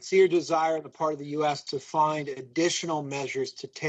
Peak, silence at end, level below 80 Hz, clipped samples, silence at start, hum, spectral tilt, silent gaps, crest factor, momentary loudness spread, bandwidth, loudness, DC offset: -10 dBFS; 0 s; -76 dBFS; under 0.1%; 0 s; none; -4 dB/octave; none; 16 dB; 10 LU; 8.6 kHz; -27 LUFS; under 0.1%